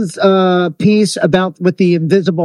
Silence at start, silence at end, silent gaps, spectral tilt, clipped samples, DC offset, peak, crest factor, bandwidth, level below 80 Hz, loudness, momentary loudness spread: 0 s; 0 s; none; -6.5 dB/octave; 0.1%; under 0.1%; 0 dBFS; 12 dB; 12 kHz; -52 dBFS; -12 LUFS; 2 LU